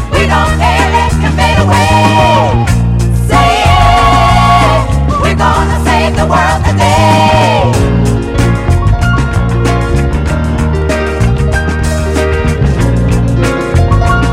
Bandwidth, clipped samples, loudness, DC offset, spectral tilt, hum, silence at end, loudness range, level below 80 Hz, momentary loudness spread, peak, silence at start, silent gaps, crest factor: 15 kHz; 2%; -9 LUFS; under 0.1%; -6 dB/octave; none; 0 s; 4 LU; -16 dBFS; 5 LU; 0 dBFS; 0 s; none; 8 dB